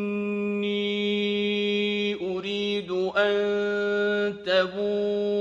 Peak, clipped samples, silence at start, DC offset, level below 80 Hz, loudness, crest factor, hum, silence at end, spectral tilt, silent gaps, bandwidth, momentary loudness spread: -10 dBFS; under 0.1%; 0 s; under 0.1%; -66 dBFS; -26 LUFS; 16 dB; none; 0 s; -5.5 dB/octave; none; 7.6 kHz; 4 LU